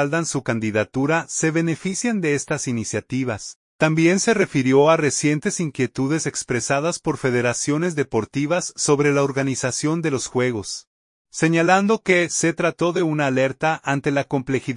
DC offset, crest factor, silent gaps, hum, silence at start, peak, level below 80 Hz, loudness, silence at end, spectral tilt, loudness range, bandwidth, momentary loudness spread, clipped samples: under 0.1%; 18 dB; 3.56-3.79 s, 10.87-11.25 s; none; 0 s; -2 dBFS; -58 dBFS; -20 LUFS; 0 s; -4.5 dB/octave; 3 LU; 11 kHz; 7 LU; under 0.1%